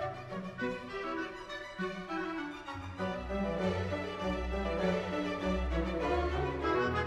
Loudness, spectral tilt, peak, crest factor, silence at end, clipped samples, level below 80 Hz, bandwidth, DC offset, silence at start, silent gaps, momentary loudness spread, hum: -36 LUFS; -6.5 dB/octave; -20 dBFS; 16 dB; 0 s; under 0.1%; -44 dBFS; 12 kHz; under 0.1%; 0 s; none; 9 LU; none